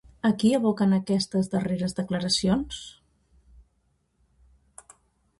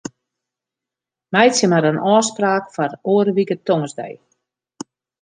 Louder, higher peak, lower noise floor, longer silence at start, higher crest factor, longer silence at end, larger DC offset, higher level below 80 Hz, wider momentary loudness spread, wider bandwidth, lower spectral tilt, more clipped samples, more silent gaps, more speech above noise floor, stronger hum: second, -25 LUFS vs -17 LUFS; second, -10 dBFS vs 0 dBFS; second, -70 dBFS vs -87 dBFS; second, 0.25 s vs 1.3 s; about the same, 16 dB vs 18 dB; first, 2.5 s vs 1.1 s; neither; first, -54 dBFS vs -66 dBFS; second, 8 LU vs 22 LU; first, 11.5 kHz vs 10 kHz; about the same, -5.5 dB/octave vs -4.5 dB/octave; neither; neither; second, 46 dB vs 70 dB; neither